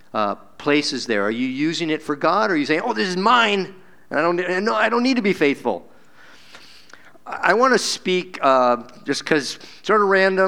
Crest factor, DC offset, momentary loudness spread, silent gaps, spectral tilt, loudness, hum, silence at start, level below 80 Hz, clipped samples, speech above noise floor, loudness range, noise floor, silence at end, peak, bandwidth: 20 dB; 0.5%; 10 LU; none; -4 dB/octave; -19 LUFS; none; 0.15 s; -68 dBFS; under 0.1%; 30 dB; 3 LU; -49 dBFS; 0 s; 0 dBFS; 16 kHz